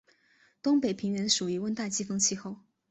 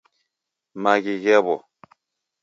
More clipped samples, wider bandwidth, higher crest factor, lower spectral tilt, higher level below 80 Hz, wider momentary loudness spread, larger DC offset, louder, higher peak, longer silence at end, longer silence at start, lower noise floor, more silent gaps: neither; first, 8.4 kHz vs 7.6 kHz; about the same, 20 dB vs 20 dB; second, -3 dB/octave vs -5 dB/octave; about the same, -70 dBFS vs -74 dBFS; about the same, 11 LU vs 10 LU; neither; second, -29 LUFS vs -20 LUFS; second, -10 dBFS vs -2 dBFS; second, 0.35 s vs 0.85 s; about the same, 0.65 s vs 0.75 s; second, -66 dBFS vs -82 dBFS; neither